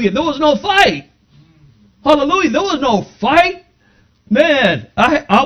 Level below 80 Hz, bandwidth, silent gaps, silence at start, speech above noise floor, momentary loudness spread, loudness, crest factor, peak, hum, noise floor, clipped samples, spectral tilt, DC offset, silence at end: -44 dBFS; 14 kHz; none; 0 s; 40 dB; 6 LU; -13 LUFS; 14 dB; 0 dBFS; 60 Hz at -55 dBFS; -53 dBFS; 0.1%; -4.5 dB/octave; under 0.1%; 0 s